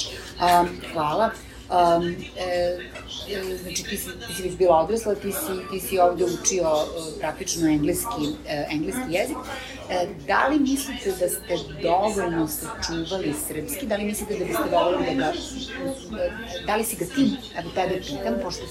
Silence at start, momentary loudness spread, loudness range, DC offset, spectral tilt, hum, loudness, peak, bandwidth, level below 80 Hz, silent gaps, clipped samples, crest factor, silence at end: 0 s; 10 LU; 3 LU; under 0.1%; -4 dB/octave; none; -25 LUFS; -4 dBFS; 16 kHz; -46 dBFS; none; under 0.1%; 20 dB; 0 s